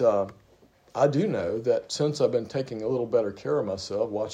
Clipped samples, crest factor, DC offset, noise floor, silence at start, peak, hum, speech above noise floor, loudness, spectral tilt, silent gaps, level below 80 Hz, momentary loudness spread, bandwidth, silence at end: under 0.1%; 18 dB; under 0.1%; -59 dBFS; 0 s; -8 dBFS; none; 33 dB; -27 LUFS; -6 dB/octave; none; -66 dBFS; 6 LU; 10.5 kHz; 0 s